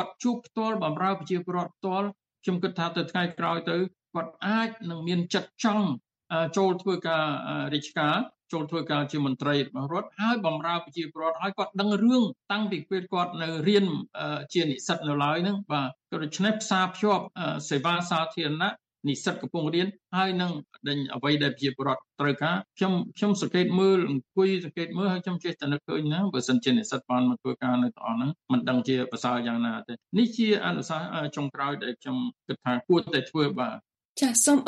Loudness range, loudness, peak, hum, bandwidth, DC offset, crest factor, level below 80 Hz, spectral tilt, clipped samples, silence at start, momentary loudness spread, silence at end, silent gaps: 3 LU; -28 LUFS; -8 dBFS; none; 10.5 kHz; under 0.1%; 20 dB; -74 dBFS; -4.5 dB/octave; under 0.1%; 0 s; 8 LU; 0 s; 34.05-34.15 s